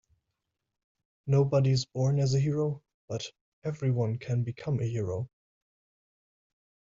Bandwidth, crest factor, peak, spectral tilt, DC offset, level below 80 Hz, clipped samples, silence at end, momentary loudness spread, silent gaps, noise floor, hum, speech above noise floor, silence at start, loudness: 7.6 kHz; 16 dB; -14 dBFS; -7 dB/octave; under 0.1%; -62 dBFS; under 0.1%; 1.55 s; 14 LU; 2.94-3.08 s, 3.41-3.62 s; -84 dBFS; none; 56 dB; 1.25 s; -30 LUFS